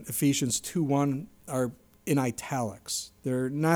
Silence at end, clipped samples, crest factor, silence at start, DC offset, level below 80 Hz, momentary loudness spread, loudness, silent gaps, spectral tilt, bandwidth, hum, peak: 0 s; under 0.1%; 18 dB; 0 s; under 0.1%; -64 dBFS; 8 LU; -29 LUFS; none; -5 dB/octave; over 20 kHz; none; -12 dBFS